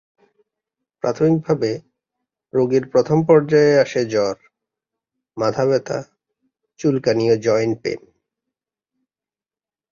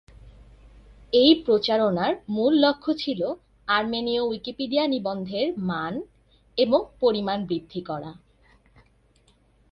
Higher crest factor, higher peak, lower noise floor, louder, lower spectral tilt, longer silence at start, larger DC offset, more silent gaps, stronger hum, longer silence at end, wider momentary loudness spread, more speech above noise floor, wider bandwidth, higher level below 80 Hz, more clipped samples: about the same, 18 dB vs 20 dB; first, -2 dBFS vs -6 dBFS; first, under -90 dBFS vs -61 dBFS; first, -18 LUFS vs -24 LUFS; about the same, -6.5 dB/octave vs -7 dB/octave; first, 1.05 s vs 0.25 s; neither; neither; neither; first, 1.95 s vs 1.6 s; about the same, 13 LU vs 14 LU; first, over 73 dB vs 38 dB; first, 7.2 kHz vs 6.2 kHz; about the same, -60 dBFS vs -56 dBFS; neither